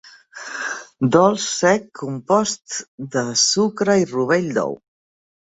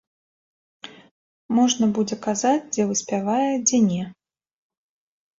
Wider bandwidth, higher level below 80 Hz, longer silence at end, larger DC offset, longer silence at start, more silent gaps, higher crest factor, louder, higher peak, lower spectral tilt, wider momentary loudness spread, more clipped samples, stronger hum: about the same, 8.4 kHz vs 7.8 kHz; first, -60 dBFS vs -66 dBFS; second, 0.8 s vs 1.3 s; neither; second, 0.35 s vs 0.85 s; second, 2.88-2.98 s vs 1.11-1.49 s; about the same, 18 dB vs 16 dB; about the same, -19 LUFS vs -21 LUFS; first, -2 dBFS vs -8 dBFS; about the same, -3.5 dB/octave vs -4 dB/octave; second, 14 LU vs 22 LU; neither; neither